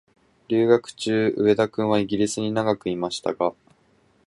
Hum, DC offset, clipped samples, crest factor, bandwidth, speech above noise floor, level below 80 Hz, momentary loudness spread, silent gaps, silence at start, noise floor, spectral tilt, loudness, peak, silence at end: none; under 0.1%; under 0.1%; 20 dB; 11.5 kHz; 39 dB; -60 dBFS; 7 LU; none; 0.5 s; -61 dBFS; -5.5 dB/octave; -23 LUFS; -4 dBFS; 0.75 s